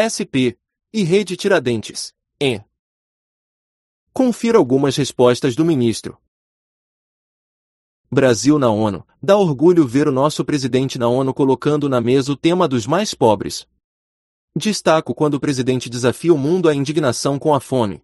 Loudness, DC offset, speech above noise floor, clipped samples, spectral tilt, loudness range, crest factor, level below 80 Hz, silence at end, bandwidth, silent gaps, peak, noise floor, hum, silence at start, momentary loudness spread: -17 LUFS; under 0.1%; over 74 dB; under 0.1%; -5.5 dB/octave; 5 LU; 18 dB; -54 dBFS; 0.1 s; 12 kHz; 2.79-4.07 s, 6.28-8.04 s, 13.84-14.48 s; 0 dBFS; under -90 dBFS; none; 0 s; 8 LU